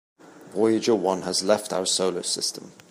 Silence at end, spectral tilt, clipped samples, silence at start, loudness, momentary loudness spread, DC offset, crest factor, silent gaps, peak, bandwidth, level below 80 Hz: 0.2 s; -3 dB/octave; under 0.1%; 0.25 s; -24 LUFS; 6 LU; under 0.1%; 20 dB; none; -6 dBFS; 15.5 kHz; -74 dBFS